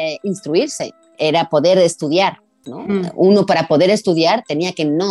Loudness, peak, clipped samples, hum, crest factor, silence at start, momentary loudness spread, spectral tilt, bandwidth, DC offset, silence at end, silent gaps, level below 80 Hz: -16 LUFS; -4 dBFS; under 0.1%; none; 12 dB; 0 s; 10 LU; -5 dB/octave; 12 kHz; under 0.1%; 0 s; none; -62 dBFS